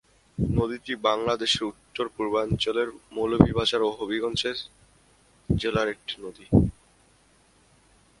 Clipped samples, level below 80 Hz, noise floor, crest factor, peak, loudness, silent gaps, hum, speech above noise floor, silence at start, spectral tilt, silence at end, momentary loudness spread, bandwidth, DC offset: under 0.1%; -42 dBFS; -60 dBFS; 26 dB; 0 dBFS; -26 LUFS; none; none; 35 dB; 0.4 s; -5.5 dB/octave; 1.5 s; 12 LU; 11.5 kHz; under 0.1%